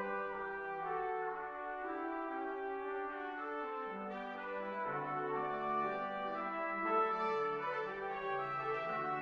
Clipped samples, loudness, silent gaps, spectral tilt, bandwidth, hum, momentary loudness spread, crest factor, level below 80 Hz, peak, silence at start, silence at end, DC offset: under 0.1%; -39 LUFS; none; -7 dB/octave; 7.4 kHz; none; 7 LU; 18 dB; -72 dBFS; -22 dBFS; 0 s; 0 s; under 0.1%